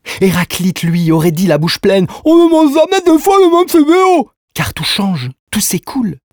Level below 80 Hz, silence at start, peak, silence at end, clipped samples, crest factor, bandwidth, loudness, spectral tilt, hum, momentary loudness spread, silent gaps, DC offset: -44 dBFS; 0.05 s; 0 dBFS; 0.15 s; under 0.1%; 10 dB; over 20 kHz; -11 LUFS; -5 dB/octave; none; 10 LU; 4.37-4.48 s, 5.39-5.47 s; under 0.1%